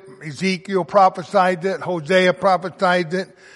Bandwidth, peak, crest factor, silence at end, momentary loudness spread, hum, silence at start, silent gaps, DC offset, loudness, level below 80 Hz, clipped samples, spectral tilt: 11.5 kHz; -2 dBFS; 16 dB; 0.3 s; 9 LU; none; 0.05 s; none; under 0.1%; -19 LUFS; -68 dBFS; under 0.1%; -5.5 dB/octave